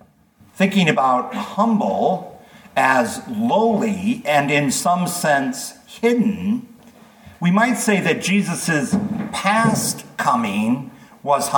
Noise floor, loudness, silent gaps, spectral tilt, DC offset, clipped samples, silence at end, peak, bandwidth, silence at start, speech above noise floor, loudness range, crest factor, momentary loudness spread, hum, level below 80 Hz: -52 dBFS; -19 LUFS; none; -4.5 dB/octave; under 0.1%; under 0.1%; 0 s; -2 dBFS; 19 kHz; 0.55 s; 34 dB; 2 LU; 18 dB; 9 LU; none; -60 dBFS